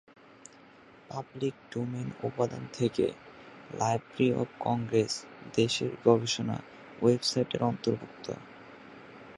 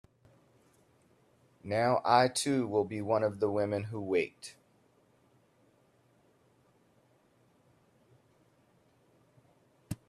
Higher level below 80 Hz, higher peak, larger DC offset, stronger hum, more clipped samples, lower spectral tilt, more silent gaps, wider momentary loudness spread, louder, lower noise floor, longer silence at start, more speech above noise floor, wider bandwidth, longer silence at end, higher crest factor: first, -66 dBFS vs -72 dBFS; about the same, -8 dBFS vs -10 dBFS; neither; neither; neither; about the same, -5.5 dB/octave vs -5 dB/octave; neither; first, 22 LU vs 18 LU; about the same, -31 LUFS vs -30 LUFS; second, -55 dBFS vs -68 dBFS; second, 1.1 s vs 1.65 s; second, 25 dB vs 38 dB; second, 11.5 kHz vs 14 kHz; second, 0 s vs 0.15 s; about the same, 24 dB vs 26 dB